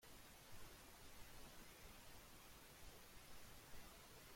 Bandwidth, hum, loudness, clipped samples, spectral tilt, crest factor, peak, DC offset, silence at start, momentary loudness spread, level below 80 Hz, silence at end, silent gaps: 16.5 kHz; none; -62 LUFS; under 0.1%; -2.5 dB/octave; 14 dB; -44 dBFS; under 0.1%; 0 s; 1 LU; -68 dBFS; 0 s; none